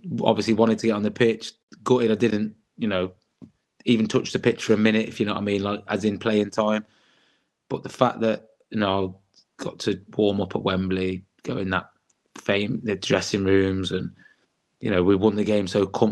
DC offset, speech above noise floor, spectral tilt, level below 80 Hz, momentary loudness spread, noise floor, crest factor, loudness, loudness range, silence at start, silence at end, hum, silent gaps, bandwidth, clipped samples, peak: under 0.1%; 44 dB; -6 dB/octave; -64 dBFS; 12 LU; -67 dBFS; 22 dB; -24 LUFS; 4 LU; 0.05 s; 0 s; none; 1.63-1.68 s; 11.5 kHz; under 0.1%; -2 dBFS